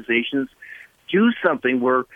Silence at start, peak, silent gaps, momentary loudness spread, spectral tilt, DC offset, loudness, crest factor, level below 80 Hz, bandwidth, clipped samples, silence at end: 0 s; -4 dBFS; none; 21 LU; -7.5 dB/octave; under 0.1%; -20 LUFS; 16 dB; -64 dBFS; 3.7 kHz; under 0.1%; 0.1 s